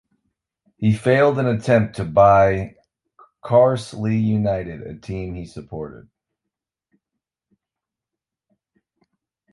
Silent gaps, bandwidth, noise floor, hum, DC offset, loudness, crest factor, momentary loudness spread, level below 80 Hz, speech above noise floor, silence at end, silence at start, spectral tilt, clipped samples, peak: none; 11.5 kHz; -86 dBFS; none; under 0.1%; -18 LUFS; 20 dB; 19 LU; -46 dBFS; 68 dB; 3.55 s; 0.8 s; -8 dB/octave; under 0.1%; -2 dBFS